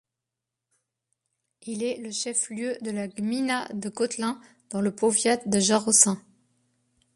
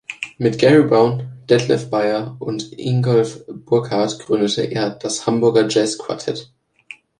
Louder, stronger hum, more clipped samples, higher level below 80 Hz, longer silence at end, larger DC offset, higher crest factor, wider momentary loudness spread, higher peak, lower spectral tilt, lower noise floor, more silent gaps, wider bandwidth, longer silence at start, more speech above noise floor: second, -25 LUFS vs -18 LUFS; neither; neither; second, -70 dBFS vs -58 dBFS; first, 0.95 s vs 0.75 s; neither; first, 24 dB vs 16 dB; first, 16 LU vs 13 LU; about the same, -2 dBFS vs -2 dBFS; second, -3 dB/octave vs -5.5 dB/octave; first, -86 dBFS vs -43 dBFS; neither; about the same, 11.5 kHz vs 11 kHz; first, 1.65 s vs 0.1 s; first, 61 dB vs 26 dB